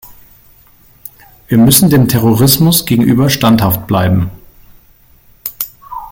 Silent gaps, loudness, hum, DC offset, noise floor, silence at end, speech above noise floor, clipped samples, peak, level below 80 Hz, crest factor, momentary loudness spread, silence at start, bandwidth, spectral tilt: none; -10 LUFS; none; under 0.1%; -45 dBFS; 0 s; 36 dB; under 0.1%; 0 dBFS; -38 dBFS; 12 dB; 18 LU; 0.05 s; 17 kHz; -5 dB/octave